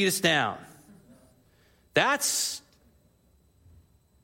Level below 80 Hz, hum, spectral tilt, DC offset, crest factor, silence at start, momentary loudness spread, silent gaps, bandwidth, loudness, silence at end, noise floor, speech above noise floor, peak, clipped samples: -68 dBFS; none; -2 dB/octave; under 0.1%; 24 dB; 0 s; 13 LU; none; 16.5 kHz; -25 LUFS; 1.65 s; -64 dBFS; 38 dB; -6 dBFS; under 0.1%